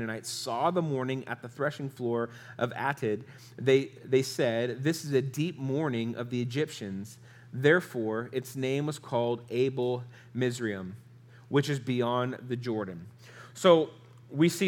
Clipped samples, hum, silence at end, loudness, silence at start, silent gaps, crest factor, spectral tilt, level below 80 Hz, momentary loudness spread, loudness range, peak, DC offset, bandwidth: under 0.1%; none; 0 s; -30 LUFS; 0 s; none; 22 dB; -5.5 dB/octave; -78 dBFS; 13 LU; 3 LU; -8 dBFS; under 0.1%; 18 kHz